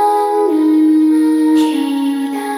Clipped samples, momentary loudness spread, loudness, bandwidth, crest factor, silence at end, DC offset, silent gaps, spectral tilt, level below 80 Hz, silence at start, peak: under 0.1%; 6 LU; -13 LUFS; 15 kHz; 8 dB; 0 s; under 0.1%; none; -4 dB/octave; -68 dBFS; 0 s; -4 dBFS